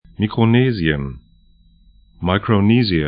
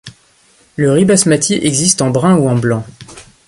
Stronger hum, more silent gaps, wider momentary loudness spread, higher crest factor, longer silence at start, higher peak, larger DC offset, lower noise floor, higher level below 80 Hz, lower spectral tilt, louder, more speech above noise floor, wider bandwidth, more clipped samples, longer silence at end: neither; neither; about the same, 10 LU vs 10 LU; about the same, 18 dB vs 14 dB; first, 0.2 s vs 0.05 s; about the same, 0 dBFS vs 0 dBFS; neither; about the same, -51 dBFS vs -50 dBFS; first, -38 dBFS vs -48 dBFS; first, -12.5 dB/octave vs -4.5 dB/octave; second, -17 LUFS vs -12 LUFS; about the same, 35 dB vs 38 dB; second, 5.2 kHz vs 11.5 kHz; neither; second, 0 s vs 0.25 s